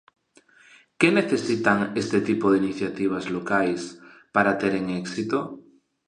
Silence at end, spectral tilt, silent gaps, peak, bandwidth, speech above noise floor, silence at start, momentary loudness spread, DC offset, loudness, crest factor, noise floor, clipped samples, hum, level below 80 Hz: 0.45 s; -5.5 dB/octave; none; -4 dBFS; 10.5 kHz; 34 dB; 1 s; 8 LU; under 0.1%; -24 LUFS; 22 dB; -57 dBFS; under 0.1%; none; -62 dBFS